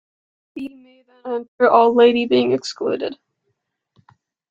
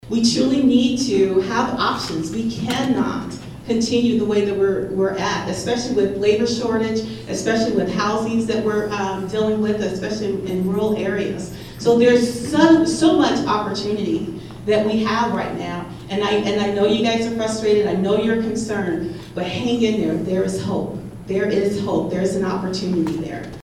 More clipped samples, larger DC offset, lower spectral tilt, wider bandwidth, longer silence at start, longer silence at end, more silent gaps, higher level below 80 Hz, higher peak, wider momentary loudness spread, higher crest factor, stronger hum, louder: neither; neither; about the same, -5 dB/octave vs -5.5 dB/octave; second, 7.8 kHz vs 14.5 kHz; first, 0.55 s vs 0.05 s; first, 1.35 s vs 0 s; first, 1.48-1.58 s vs none; second, -66 dBFS vs -46 dBFS; about the same, -2 dBFS vs -2 dBFS; first, 21 LU vs 10 LU; about the same, 18 dB vs 18 dB; neither; first, -17 LUFS vs -20 LUFS